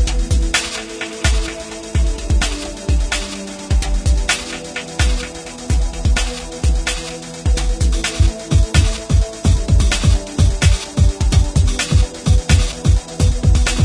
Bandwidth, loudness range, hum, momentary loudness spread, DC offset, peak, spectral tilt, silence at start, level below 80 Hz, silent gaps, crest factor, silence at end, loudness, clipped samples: 10.5 kHz; 4 LU; none; 9 LU; under 0.1%; 0 dBFS; -4.5 dB/octave; 0 s; -18 dBFS; none; 16 dB; 0 s; -18 LUFS; under 0.1%